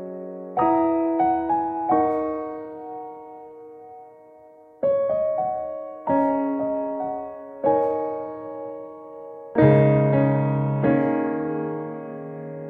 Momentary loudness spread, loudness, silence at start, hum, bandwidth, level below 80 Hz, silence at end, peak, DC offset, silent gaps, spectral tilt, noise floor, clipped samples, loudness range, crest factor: 19 LU; -23 LUFS; 0 s; none; 3.7 kHz; -58 dBFS; 0 s; -4 dBFS; under 0.1%; none; -11.5 dB/octave; -49 dBFS; under 0.1%; 7 LU; 20 dB